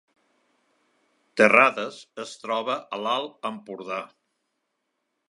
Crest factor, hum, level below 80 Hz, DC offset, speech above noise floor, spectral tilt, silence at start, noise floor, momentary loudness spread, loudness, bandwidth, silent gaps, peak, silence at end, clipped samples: 26 dB; none; -82 dBFS; under 0.1%; 54 dB; -4 dB/octave; 1.35 s; -78 dBFS; 21 LU; -23 LUFS; 11.5 kHz; none; 0 dBFS; 1.25 s; under 0.1%